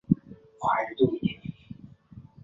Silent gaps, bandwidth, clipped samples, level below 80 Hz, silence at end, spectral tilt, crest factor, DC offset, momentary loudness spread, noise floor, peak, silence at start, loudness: none; 7.6 kHz; under 0.1%; -56 dBFS; 0.2 s; -8 dB/octave; 24 dB; under 0.1%; 21 LU; -50 dBFS; -6 dBFS; 0.1 s; -28 LUFS